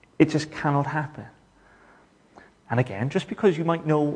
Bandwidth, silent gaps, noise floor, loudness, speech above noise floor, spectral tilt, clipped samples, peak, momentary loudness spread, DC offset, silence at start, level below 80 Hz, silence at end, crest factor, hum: 10 kHz; none; -56 dBFS; -25 LUFS; 33 dB; -7 dB/octave; under 0.1%; -2 dBFS; 7 LU; under 0.1%; 0.2 s; -62 dBFS; 0 s; 22 dB; none